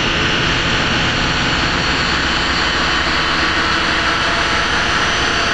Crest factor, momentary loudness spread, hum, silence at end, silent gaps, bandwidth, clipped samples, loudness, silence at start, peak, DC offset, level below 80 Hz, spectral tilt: 12 dB; 1 LU; none; 0 s; none; 10.5 kHz; under 0.1%; -14 LUFS; 0 s; -4 dBFS; 2%; -30 dBFS; -3 dB/octave